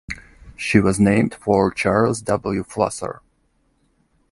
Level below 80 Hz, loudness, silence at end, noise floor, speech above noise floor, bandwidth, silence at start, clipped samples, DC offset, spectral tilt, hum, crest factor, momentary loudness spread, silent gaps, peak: -44 dBFS; -19 LUFS; 1.2 s; -64 dBFS; 45 dB; 11.5 kHz; 0.1 s; under 0.1%; under 0.1%; -6 dB/octave; none; 20 dB; 15 LU; none; 0 dBFS